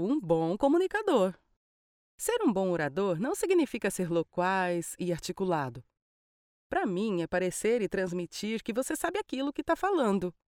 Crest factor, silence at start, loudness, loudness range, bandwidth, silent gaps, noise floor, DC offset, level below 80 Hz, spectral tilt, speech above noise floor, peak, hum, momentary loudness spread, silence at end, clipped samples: 16 dB; 0 s; -30 LUFS; 3 LU; 17.5 kHz; 1.56-2.18 s, 6.02-6.70 s; under -90 dBFS; under 0.1%; -60 dBFS; -5 dB/octave; over 61 dB; -14 dBFS; none; 7 LU; 0.25 s; under 0.1%